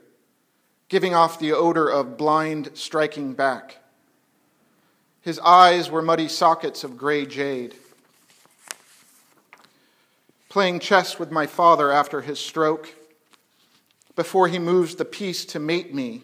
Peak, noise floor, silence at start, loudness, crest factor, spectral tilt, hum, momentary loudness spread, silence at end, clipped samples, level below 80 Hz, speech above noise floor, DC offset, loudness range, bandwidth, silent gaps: 0 dBFS; -67 dBFS; 0.9 s; -21 LUFS; 22 dB; -4.5 dB/octave; none; 14 LU; 0.05 s; under 0.1%; -78 dBFS; 46 dB; under 0.1%; 10 LU; 16 kHz; none